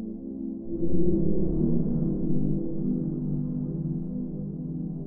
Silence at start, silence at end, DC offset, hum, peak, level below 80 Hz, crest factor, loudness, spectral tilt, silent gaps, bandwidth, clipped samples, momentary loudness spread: 0 s; 0 s; under 0.1%; none; -10 dBFS; -40 dBFS; 14 dB; -29 LUFS; -16 dB/octave; none; 1.6 kHz; under 0.1%; 8 LU